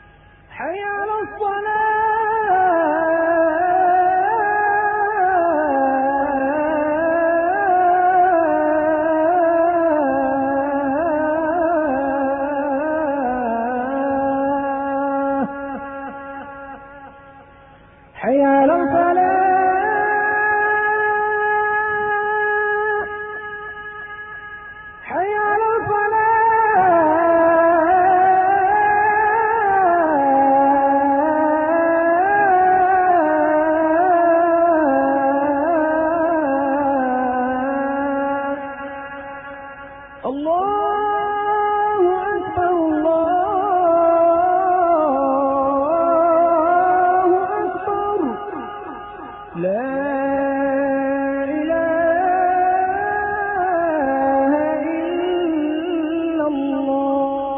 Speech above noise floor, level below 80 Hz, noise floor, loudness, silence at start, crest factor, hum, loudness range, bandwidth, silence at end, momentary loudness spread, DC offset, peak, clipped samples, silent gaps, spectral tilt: 25 dB; -50 dBFS; -47 dBFS; -17 LUFS; 0.5 s; 12 dB; none; 7 LU; 3.6 kHz; 0 s; 13 LU; under 0.1%; -6 dBFS; under 0.1%; none; -10.5 dB/octave